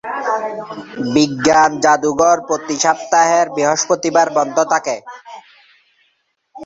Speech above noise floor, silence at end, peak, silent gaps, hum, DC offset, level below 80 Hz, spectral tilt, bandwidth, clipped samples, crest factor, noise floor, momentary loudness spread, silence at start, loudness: 49 dB; 0 s; 0 dBFS; none; none; under 0.1%; -56 dBFS; -3 dB/octave; 8 kHz; under 0.1%; 16 dB; -64 dBFS; 13 LU; 0.05 s; -15 LUFS